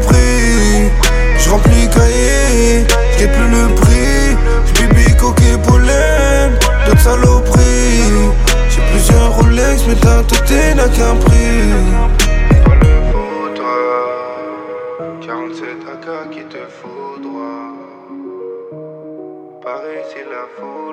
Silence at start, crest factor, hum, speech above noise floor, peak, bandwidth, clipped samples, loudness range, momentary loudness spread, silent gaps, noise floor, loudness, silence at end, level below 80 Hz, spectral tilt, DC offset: 0 s; 10 dB; none; 22 dB; 0 dBFS; 15 kHz; under 0.1%; 17 LU; 19 LU; none; -31 dBFS; -11 LUFS; 0 s; -12 dBFS; -5 dB/octave; under 0.1%